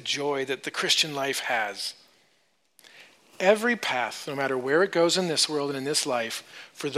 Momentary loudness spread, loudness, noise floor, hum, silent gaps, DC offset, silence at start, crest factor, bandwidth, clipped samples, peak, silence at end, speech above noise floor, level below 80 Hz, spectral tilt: 10 LU; -25 LUFS; -69 dBFS; none; none; under 0.1%; 0 s; 20 dB; 15.5 kHz; under 0.1%; -8 dBFS; 0 s; 42 dB; -82 dBFS; -2.5 dB/octave